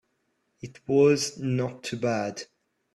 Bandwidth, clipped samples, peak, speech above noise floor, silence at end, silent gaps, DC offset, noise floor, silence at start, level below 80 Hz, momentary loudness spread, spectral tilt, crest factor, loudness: 12.5 kHz; under 0.1%; -10 dBFS; 49 dB; 0.5 s; none; under 0.1%; -74 dBFS; 0.65 s; -66 dBFS; 23 LU; -5.5 dB/octave; 18 dB; -26 LUFS